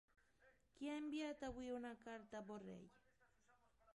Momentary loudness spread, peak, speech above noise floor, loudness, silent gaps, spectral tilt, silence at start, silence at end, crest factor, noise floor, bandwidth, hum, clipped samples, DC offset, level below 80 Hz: 11 LU; -38 dBFS; 28 dB; -52 LUFS; none; -5 dB/octave; 0.4 s; 0 s; 16 dB; -79 dBFS; 11.5 kHz; none; under 0.1%; under 0.1%; -74 dBFS